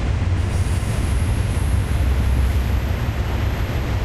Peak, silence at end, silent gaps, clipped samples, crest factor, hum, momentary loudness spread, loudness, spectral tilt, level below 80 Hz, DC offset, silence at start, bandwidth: -8 dBFS; 0 s; none; under 0.1%; 12 dB; none; 3 LU; -21 LUFS; -6.5 dB/octave; -22 dBFS; under 0.1%; 0 s; 13 kHz